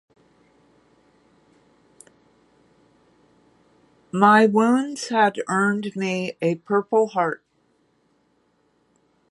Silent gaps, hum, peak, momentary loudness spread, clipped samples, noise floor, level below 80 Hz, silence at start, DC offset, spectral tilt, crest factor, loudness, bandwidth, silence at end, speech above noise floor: none; none; -2 dBFS; 10 LU; under 0.1%; -65 dBFS; -72 dBFS; 4.15 s; under 0.1%; -5.5 dB/octave; 24 dB; -20 LUFS; 11.5 kHz; 1.95 s; 46 dB